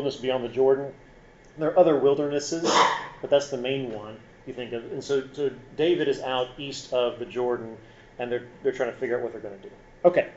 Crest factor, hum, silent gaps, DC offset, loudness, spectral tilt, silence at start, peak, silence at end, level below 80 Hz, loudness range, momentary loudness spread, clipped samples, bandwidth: 22 dB; none; none; under 0.1%; -26 LUFS; -3.5 dB/octave; 0 s; -4 dBFS; 0 s; -58 dBFS; 6 LU; 17 LU; under 0.1%; 8 kHz